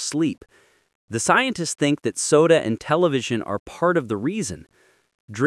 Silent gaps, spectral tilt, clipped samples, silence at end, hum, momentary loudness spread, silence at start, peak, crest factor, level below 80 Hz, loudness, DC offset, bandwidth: 0.95-1.08 s, 3.60-3.66 s, 5.15-5.28 s; -4.5 dB/octave; under 0.1%; 0 s; none; 13 LU; 0 s; -2 dBFS; 20 dB; -60 dBFS; -21 LUFS; under 0.1%; 12 kHz